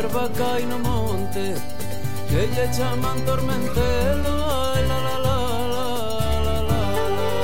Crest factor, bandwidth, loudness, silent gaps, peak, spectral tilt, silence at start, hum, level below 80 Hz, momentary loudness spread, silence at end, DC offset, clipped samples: 14 dB; 17 kHz; -24 LUFS; none; -8 dBFS; -5.5 dB/octave; 0 s; none; -30 dBFS; 5 LU; 0 s; 7%; under 0.1%